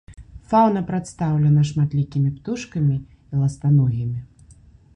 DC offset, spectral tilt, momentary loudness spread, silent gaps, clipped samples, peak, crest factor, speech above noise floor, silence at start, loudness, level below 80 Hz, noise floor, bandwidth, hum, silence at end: under 0.1%; -8.5 dB/octave; 11 LU; none; under 0.1%; -4 dBFS; 16 dB; 30 dB; 0.1 s; -21 LUFS; -46 dBFS; -49 dBFS; 9.4 kHz; none; 0.7 s